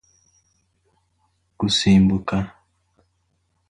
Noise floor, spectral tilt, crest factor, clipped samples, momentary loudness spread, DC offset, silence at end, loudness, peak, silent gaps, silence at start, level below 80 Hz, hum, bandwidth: -69 dBFS; -5.5 dB/octave; 18 dB; under 0.1%; 12 LU; under 0.1%; 1.2 s; -19 LUFS; -6 dBFS; none; 1.6 s; -44 dBFS; none; 10.5 kHz